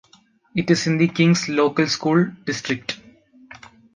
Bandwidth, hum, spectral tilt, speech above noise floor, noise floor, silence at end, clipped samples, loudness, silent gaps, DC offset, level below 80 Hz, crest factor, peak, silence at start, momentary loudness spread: 9.6 kHz; none; -5.5 dB/octave; 37 dB; -56 dBFS; 0.4 s; under 0.1%; -20 LUFS; none; under 0.1%; -60 dBFS; 18 dB; -4 dBFS; 0.55 s; 10 LU